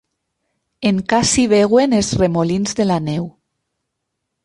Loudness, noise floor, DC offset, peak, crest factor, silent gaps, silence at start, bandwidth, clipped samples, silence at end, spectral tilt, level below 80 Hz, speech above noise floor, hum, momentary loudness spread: -16 LUFS; -76 dBFS; under 0.1%; -2 dBFS; 16 dB; none; 0.8 s; 11.5 kHz; under 0.1%; 1.15 s; -5 dB/octave; -44 dBFS; 61 dB; none; 9 LU